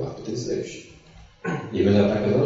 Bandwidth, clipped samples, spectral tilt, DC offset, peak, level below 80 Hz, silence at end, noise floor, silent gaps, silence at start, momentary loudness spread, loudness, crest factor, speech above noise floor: 8 kHz; under 0.1%; -7 dB/octave; under 0.1%; -6 dBFS; -52 dBFS; 0 s; -49 dBFS; none; 0 s; 16 LU; -24 LUFS; 18 dB; 27 dB